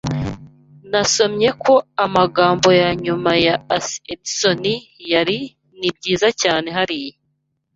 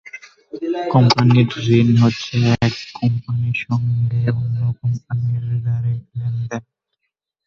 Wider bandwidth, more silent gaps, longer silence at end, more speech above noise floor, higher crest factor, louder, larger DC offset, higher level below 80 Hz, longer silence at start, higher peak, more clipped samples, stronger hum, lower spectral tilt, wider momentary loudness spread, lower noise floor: first, 8 kHz vs 7.2 kHz; neither; second, 0.65 s vs 0.85 s; second, 52 dB vs 60 dB; about the same, 18 dB vs 18 dB; about the same, -17 LUFS vs -18 LUFS; neither; about the same, -48 dBFS vs -46 dBFS; about the same, 0.05 s vs 0.05 s; about the same, 0 dBFS vs 0 dBFS; neither; neither; second, -3.5 dB/octave vs -7 dB/octave; about the same, 12 LU vs 12 LU; second, -70 dBFS vs -77 dBFS